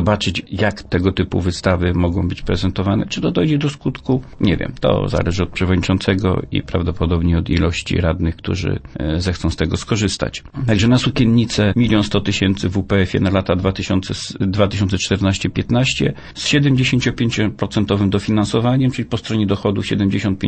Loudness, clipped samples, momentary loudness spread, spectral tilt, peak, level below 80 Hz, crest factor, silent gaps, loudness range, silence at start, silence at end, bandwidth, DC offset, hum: -18 LUFS; under 0.1%; 6 LU; -6 dB/octave; -2 dBFS; -34 dBFS; 16 dB; none; 3 LU; 0 s; 0 s; 8.8 kHz; under 0.1%; none